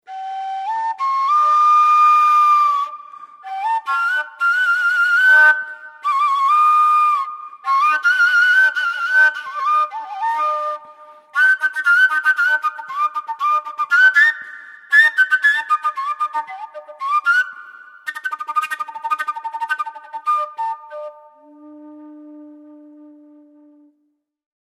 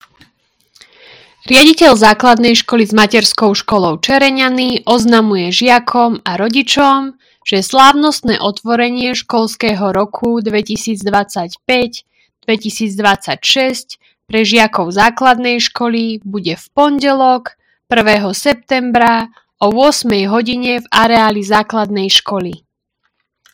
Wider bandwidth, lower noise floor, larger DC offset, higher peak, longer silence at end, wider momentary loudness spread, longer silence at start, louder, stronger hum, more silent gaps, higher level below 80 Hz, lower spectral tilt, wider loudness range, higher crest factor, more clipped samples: second, 14.5 kHz vs over 20 kHz; about the same, -68 dBFS vs -67 dBFS; neither; about the same, -2 dBFS vs 0 dBFS; first, 2.25 s vs 0.95 s; first, 17 LU vs 10 LU; second, 0.1 s vs 1.45 s; second, -16 LUFS vs -11 LUFS; neither; neither; second, under -90 dBFS vs -46 dBFS; second, 1.5 dB/octave vs -3.5 dB/octave; first, 10 LU vs 6 LU; about the same, 16 dB vs 12 dB; second, under 0.1% vs 1%